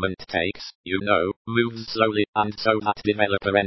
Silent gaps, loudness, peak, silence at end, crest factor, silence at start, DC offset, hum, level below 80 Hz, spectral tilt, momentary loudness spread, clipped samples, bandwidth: 0.75-0.84 s, 1.36-1.45 s, 2.28-2.33 s; -23 LUFS; -4 dBFS; 0 s; 20 dB; 0 s; under 0.1%; none; -50 dBFS; -6.5 dB/octave; 6 LU; under 0.1%; 6 kHz